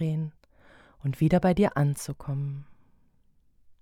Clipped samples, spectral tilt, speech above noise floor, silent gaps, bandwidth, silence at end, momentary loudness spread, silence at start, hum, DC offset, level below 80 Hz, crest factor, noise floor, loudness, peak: under 0.1%; -7.5 dB/octave; 37 dB; none; 15.5 kHz; 0.1 s; 13 LU; 0 s; none; under 0.1%; -50 dBFS; 20 dB; -63 dBFS; -27 LUFS; -10 dBFS